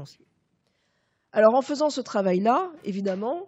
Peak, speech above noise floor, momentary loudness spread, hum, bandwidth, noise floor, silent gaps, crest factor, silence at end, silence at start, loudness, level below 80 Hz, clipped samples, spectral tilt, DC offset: -4 dBFS; 48 dB; 10 LU; none; 8.2 kHz; -72 dBFS; none; 22 dB; 0 s; 0 s; -24 LUFS; -84 dBFS; under 0.1%; -6 dB/octave; under 0.1%